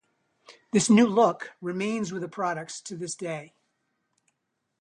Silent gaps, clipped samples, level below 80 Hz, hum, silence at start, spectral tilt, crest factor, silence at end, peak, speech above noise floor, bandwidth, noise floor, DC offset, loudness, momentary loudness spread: none; under 0.1%; -72 dBFS; none; 0.5 s; -5 dB/octave; 20 dB; 1.35 s; -8 dBFS; 54 dB; 11 kHz; -80 dBFS; under 0.1%; -26 LUFS; 16 LU